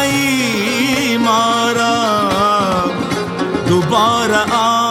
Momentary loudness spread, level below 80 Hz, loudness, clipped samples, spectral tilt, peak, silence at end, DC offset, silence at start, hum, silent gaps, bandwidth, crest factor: 5 LU; -48 dBFS; -14 LUFS; under 0.1%; -4 dB/octave; 0 dBFS; 0 s; under 0.1%; 0 s; none; none; 17 kHz; 14 dB